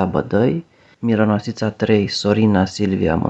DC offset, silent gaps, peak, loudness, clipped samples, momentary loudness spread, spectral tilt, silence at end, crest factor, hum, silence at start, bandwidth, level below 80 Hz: under 0.1%; none; -2 dBFS; -18 LUFS; under 0.1%; 7 LU; -6.5 dB/octave; 0 s; 16 dB; none; 0 s; 8.2 kHz; -44 dBFS